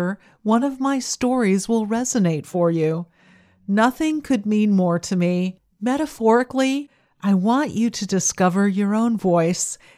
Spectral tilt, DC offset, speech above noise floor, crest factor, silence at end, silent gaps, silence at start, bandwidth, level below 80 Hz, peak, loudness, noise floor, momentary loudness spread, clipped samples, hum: -5.5 dB/octave; under 0.1%; 34 dB; 16 dB; 0.25 s; none; 0 s; 14.5 kHz; -58 dBFS; -4 dBFS; -20 LUFS; -54 dBFS; 6 LU; under 0.1%; none